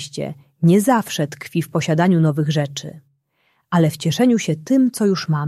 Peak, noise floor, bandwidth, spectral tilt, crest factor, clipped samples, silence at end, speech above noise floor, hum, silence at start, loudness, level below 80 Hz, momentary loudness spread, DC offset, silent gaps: -2 dBFS; -65 dBFS; 14.5 kHz; -6 dB/octave; 16 dB; under 0.1%; 0 s; 47 dB; none; 0 s; -18 LUFS; -62 dBFS; 12 LU; under 0.1%; none